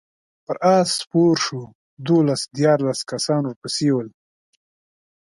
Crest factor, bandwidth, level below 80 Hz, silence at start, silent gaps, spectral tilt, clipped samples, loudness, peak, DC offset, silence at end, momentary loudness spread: 18 dB; 11.5 kHz; -66 dBFS; 0.5 s; 1.75-1.97 s, 3.56-3.62 s; -5 dB/octave; under 0.1%; -20 LUFS; -4 dBFS; under 0.1%; 1.3 s; 10 LU